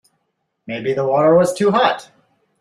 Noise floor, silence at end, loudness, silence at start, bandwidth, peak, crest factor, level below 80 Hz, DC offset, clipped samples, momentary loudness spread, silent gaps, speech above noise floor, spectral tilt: -72 dBFS; 0.6 s; -16 LUFS; 0.7 s; 13.5 kHz; -2 dBFS; 16 dB; -60 dBFS; under 0.1%; under 0.1%; 13 LU; none; 56 dB; -5.5 dB/octave